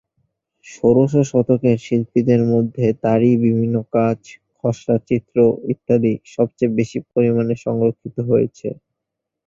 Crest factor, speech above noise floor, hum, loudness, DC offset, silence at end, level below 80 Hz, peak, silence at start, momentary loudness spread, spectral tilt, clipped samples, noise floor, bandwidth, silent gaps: 16 dB; 64 dB; none; -18 LUFS; under 0.1%; 0.75 s; -54 dBFS; -2 dBFS; 0.65 s; 8 LU; -8.5 dB/octave; under 0.1%; -81 dBFS; 7.6 kHz; none